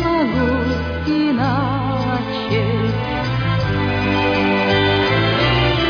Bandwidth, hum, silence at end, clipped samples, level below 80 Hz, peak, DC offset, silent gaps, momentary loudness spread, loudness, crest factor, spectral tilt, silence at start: 5.4 kHz; none; 0 s; under 0.1%; -32 dBFS; -4 dBFS; under 0.1%; none; 5 LU; -18 LUFS; 14 dB; -7.5 dB/octave; 0 s